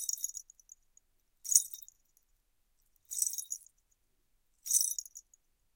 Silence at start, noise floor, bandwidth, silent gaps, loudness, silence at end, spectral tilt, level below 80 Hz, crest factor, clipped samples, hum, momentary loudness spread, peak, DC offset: 0 s; -75 dBFS; 17 kHz; none; -32 LUFS; 0.55 s; 5.5 dB/octave; -78 dBFS; 34 dB; under 0.1%; none; 20 LU; -6 dBFS; under 0.1%